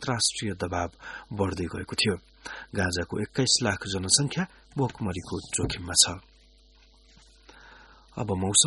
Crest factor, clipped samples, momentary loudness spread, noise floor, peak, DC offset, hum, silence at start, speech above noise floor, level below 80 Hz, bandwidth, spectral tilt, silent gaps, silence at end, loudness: 24 dB; under 0.1%; 14 LU; -57 dBFS; -4 dBFS; under 0.1%; none; 0 s; 29 dB; -52 dBFS; 11.5 kHz; -2.5 dB/octave; none; 0 s; -27 LUFS